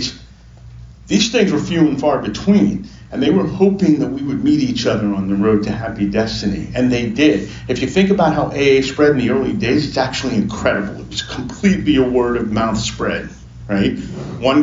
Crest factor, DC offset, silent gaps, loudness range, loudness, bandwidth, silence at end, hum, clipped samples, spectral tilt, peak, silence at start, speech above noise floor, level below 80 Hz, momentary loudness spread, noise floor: 14 dB; under 0.1%; none; 2 LU; -16 LUFS; 7.6 kHz; 0 s; none; under 0.1%; -5.5 dB/octave; -2 dBFS; 0 s; 24 dB; -38 dBFS; 9 LU; -40 dBFS